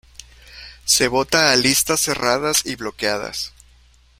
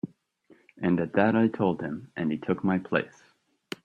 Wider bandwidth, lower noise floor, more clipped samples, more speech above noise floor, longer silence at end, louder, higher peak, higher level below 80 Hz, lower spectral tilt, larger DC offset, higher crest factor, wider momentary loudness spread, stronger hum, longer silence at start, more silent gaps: first, 16.5 kHz vs 9.2 kHz; second, -52 dBFS vs -61 dBFS; neither; about the same, 33 dB vs 35 dB; about the same, 0.7 s vs 0.75 s; first, -17 LUFS vs -27 LUFS; first, 0 dBFS vs -6 dBFS; first, -48 dBFS vs -66 dBFS; second, -1.5 dB/octave vs -8 dB/octave; neither; about the same, 20 dB vs 22 dB; about the same, 15 LU vs 13 LU; neither; first, 0.5 s vs 0.05 s; neither